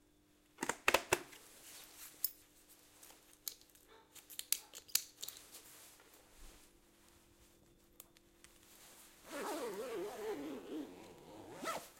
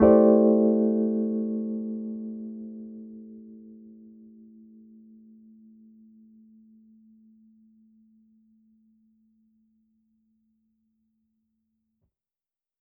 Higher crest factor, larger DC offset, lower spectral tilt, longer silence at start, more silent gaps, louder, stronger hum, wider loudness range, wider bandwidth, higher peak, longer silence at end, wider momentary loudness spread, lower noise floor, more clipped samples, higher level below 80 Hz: first, 34 dB vs 22 dB; neither; second, -1.5 dB/octave vs -7.5 dB/octave; first, 0.6 s vs 0 s; neither; second, -41 LUFS vs -24 LUFS; neither; second, 19 LU vs 29 LU; first, 16.5 kHz vs 2.5 kHz; second, -12 dBFS vs -6 dBFS; second, 0 s vs 9.1 s; second, 24 LU vs 28 LU; second, -71 dBFS vs under -90 dBFS; neither; second, -72 dBFS vs -58 dBFS